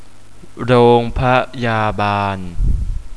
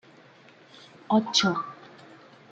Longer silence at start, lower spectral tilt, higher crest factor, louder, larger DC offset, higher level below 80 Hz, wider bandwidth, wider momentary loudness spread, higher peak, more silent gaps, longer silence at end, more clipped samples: second, 0.4 s vs 1.1 s; first, -7.5 dB/octave vs -4 dB/octave; second, 16 dB vs 22 dB; first, -16 LUFS vs -24 LUFS; first, 3% vs under 0.1%; first, -24 dBFS vs -72 dBFS; first, 11 kHz vs 9 kHz; second, 11 LU vs 19 LU; first, 0 dBFS vs -8 dBFS; neither; second, 0 s vs 0.8 s; neither